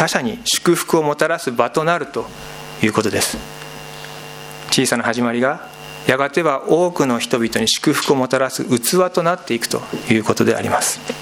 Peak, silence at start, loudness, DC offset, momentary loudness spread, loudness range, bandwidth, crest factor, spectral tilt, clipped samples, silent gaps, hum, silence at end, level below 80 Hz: 0 dBFS; 0 s; -17 LUFS; under 0.1%; 16 LU; 4 LU; 17.5 kHz; 18 dB; -3.5 dB/octave; under 0.1%; none; none; 0 s; -52 dBFS